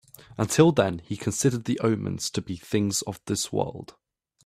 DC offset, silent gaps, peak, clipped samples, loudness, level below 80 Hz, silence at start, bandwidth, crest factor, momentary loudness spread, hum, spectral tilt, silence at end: under 0.1%; none; -4 dBFS; under 0.1%; -26 LUFS; -58 dBFS; 0.3 s; 15.5 kHz; 22 dB; 12 LU; none; -5 dB/octave; 0.6 s